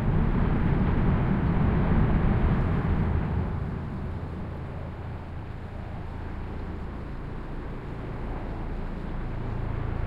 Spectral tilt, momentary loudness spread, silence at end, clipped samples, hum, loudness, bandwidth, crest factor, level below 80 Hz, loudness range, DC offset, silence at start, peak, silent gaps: -10 dB/octave; 13 LU; 0 s; under 0.1%; none; -29 LUFS; 5.2 kHz; 16 dB; -32 dBFS; 12 LU; under 0.1%; 0 s; -10 dBFS; none